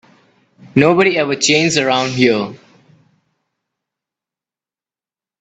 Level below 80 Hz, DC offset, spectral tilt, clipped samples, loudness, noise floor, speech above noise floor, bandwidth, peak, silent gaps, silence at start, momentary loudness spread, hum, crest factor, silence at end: -58 dBFS; under 0.1%; -4 dB/octave; under 0.1%; -14 LUFS; under -90 dBFS; over 77 dB; 9.2 kHz; 0 dBFS; none; 0.75 s; 7 LU; none; 18 dB; 2.85 s